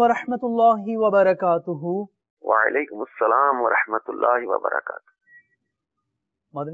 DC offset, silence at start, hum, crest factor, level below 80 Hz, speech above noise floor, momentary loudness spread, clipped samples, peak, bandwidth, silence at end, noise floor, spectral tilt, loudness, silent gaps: under 0.1%; 0 s; none; 18 dB; -70 dBFS; 59 dB; 15 LU; under 0.1%; -6 dBFS; 7.4 kHz; 0 s; -80 dBFS; -7.5 dB/octave; -21 LUFS; 2.30-2.37 s